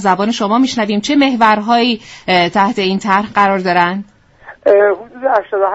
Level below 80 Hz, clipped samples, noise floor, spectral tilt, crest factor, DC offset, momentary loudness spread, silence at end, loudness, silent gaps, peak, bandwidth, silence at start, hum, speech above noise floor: -52 dBFS; under 0.1%; -39 dBFS; -5 dB/octave; 14 dB; under 0.1%; 6 LU; 0 s; -13 LUFS; none; 0 dBFS; 8 kHz; 0 s; none; 26 dB